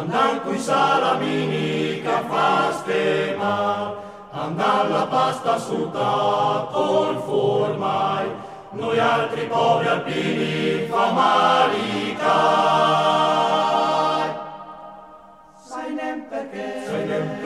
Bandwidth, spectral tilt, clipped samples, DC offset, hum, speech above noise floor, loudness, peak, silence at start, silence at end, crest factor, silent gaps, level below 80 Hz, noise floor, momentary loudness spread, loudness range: 14 kHz; -5 dB/octave; under 0.1%; under 0.1%; none; 26 dB; -21 LUFS; -4 dBFS; 0 s; 0 s; 16 dB; none; -64 dBFS; -47 dBFS; 13 LU; 4 LU